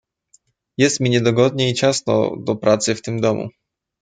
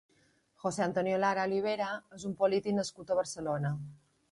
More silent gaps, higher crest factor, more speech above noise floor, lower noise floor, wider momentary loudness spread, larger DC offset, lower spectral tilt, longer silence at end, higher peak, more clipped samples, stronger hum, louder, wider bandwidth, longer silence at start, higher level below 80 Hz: neither; about the same, 18 dB vs 18 dB; first, 41 dB vs 37 dB; second, -59 dBFS vs -69 dBFS; second, 6 LU vs 9 LU; neither; about the same, -4.5 dB/octave vs -5.5 dB/octave; first, 0.55 s vs 0.35 s; first, -2 dBFS vs -16 dBFS; neither; neither; first, -18 LUFS vs -33 LUFS; second, 9.6 kHz vs 11.5 kHz; first, 0.8 s vs 0.65 s; first, -60 dBFS vs -70 dBFS